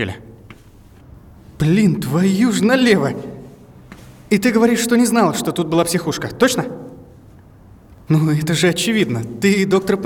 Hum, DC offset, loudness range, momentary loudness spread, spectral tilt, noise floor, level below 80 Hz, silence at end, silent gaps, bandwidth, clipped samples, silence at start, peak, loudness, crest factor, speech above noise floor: none; under 0.1%; 3 LU; 12 LU; -5.5 dB/octave; -44 dBFS; -48 dBFS; 0 s; none; 18 kHz; under 0.1%; 0 s; 0 dBFS; -16 LUFS; 18 dB; 28 dB